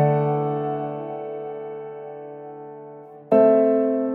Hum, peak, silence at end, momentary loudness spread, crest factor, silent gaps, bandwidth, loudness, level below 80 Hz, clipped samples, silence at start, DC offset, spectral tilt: none; -4 dBFS; 0 s; 22 LU; 18 dB; none; 4.2 kHz; -21 LUFS; -76 dBFS; under 0.1%; 0 s; under 0.1%; -11.5 dB/octave